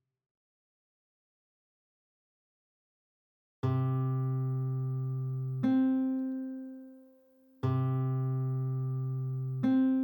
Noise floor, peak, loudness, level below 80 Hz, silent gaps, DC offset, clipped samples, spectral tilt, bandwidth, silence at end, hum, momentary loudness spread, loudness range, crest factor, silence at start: -63 dBFS; -20 dBFS; -32 LUFS; -78 dBFS; none; under 0.1%; under 0.1%; -11 dB/octave; 17.5 kHz; 0 s; none; 9 LU; 5 LU; 14 dB; 3.65 s